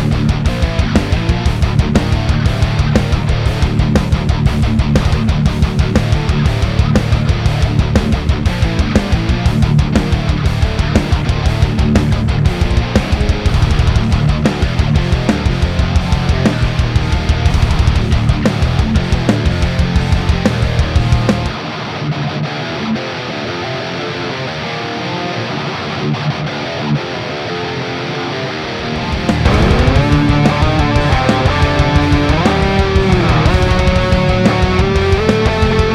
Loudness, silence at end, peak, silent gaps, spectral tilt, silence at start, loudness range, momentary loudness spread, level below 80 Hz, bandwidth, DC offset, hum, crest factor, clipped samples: -14 LUFS; 0 s; 0 dBFS; none; -6.5 dB/octave; 0 s; 7 LU; 8 LU; -18 dBFS; 12 kHz; under 0.1%; none; 12 dB; under 0.1%